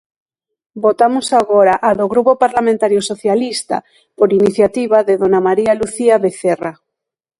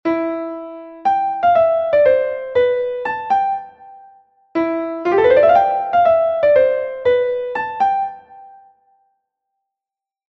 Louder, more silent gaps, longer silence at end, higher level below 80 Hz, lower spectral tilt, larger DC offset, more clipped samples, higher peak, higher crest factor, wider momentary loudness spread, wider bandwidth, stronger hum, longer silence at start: about the same, -14 LUFS vs -16 LUFS; neither; second, 0.7 s vs 1.8 s; about the same, -54 dBFS vs -56 dBFS; second, -5 dB/octave vs -6.5 dB/octave; neither; neither; about the same, 0 dBFS vs -2 dBFS; about the same, 14 dB vs 16 dB; second, 6 LU vs 10 LU; first, 11.5 kHz vs 6 kHz; neither; first, 0.75 s vs 0.05 s